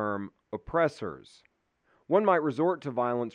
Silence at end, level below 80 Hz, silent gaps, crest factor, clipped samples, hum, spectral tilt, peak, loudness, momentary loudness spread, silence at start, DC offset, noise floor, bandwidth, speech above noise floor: 0.05 s; -60 dBFS; none; 20 dB; under 0.1%; none; -7.5 dB/octave; -10 dBFS; -28 LUFS; 15 LU; 0 s; under 0.1%; -71 dBFS; 10 kHz; 43 dB